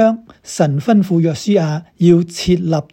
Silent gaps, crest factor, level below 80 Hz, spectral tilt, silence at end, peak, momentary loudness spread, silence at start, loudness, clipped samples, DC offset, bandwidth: none; 14 dB; -44 dBFS; -7 dB/octave; 0.1 s; 0 dBFS; 7 LU; 0 s; -15 LUFS; under 0.1%; under 0.1%; 15 kHz